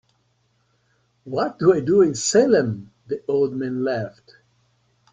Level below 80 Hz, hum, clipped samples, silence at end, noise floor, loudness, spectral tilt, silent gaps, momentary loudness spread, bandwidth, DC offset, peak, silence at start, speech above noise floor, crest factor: -60 dBFS; none; under 0.1%; 1.05 s; -66 dBFS; -20 LUFS; -5 dB/octave; none; 13 LU; 9.6 kHz; under 0.1%; -4 dBFS; 1.25 s; 46 dB; 18 dB